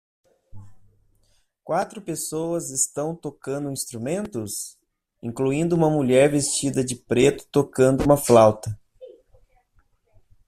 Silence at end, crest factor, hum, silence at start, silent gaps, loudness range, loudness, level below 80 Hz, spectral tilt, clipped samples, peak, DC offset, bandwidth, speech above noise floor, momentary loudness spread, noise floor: 1.4 s; 20 dB; none; 0.55 s; none; 9 LU; -22 LUFS; -50 dBFS; -5 dB/octave; under 0.1%; -2 dBFS; under 0.1%; 15.5 kHz; 43 dB; 15 LU; -64 dBFS